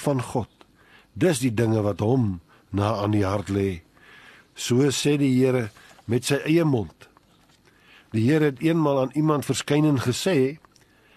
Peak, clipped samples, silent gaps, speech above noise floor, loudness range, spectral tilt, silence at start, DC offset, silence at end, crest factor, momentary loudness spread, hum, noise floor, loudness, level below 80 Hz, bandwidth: -8 dBFS; under 0.1%; none; 36 dB; 2 LU; -6 dB/octave; 0 s; under 0.1%; 0.6 s; 16 dB; 10 LU; none; -58 dBFS; -23 LUFS; -56 dBFS; 13 kHz